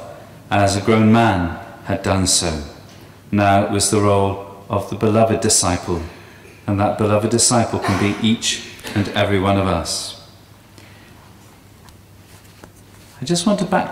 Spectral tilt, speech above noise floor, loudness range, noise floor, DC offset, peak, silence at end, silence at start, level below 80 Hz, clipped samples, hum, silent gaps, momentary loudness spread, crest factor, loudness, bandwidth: -4.5 dB/octave; 28 dB; 8 LU; -45 dBFS; under 0.1%; -2 dBFS; 0 s; 0 s; -44 dBFS; under 0.1%; none; none; 12 LU; 16 dB; -17 LUFS; 16 kHz